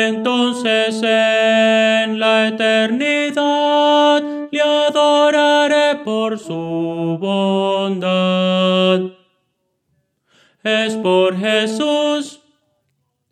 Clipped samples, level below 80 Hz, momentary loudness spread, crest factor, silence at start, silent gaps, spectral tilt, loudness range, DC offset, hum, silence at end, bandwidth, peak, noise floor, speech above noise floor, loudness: under 0.1%; -70 dBFS; 8 LU; 14 dB; 0 s; none; -4.5 dB/octave; 5 LU; under 0.1%; none; 1 s; 11.5 kHz; -2 dBFS; -69 dBFS; 54 dB; -15 LUFS